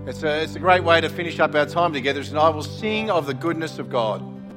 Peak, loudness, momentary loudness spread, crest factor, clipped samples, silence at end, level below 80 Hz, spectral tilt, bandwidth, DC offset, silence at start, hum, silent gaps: -2 dBFS; -21 LUFS; 7 LU; 20 dB; under 0.1%; 0 s; -54 dBFS; -5.5 dB/octave; 16.5 kHz; under 0.1%; 0 s; none; none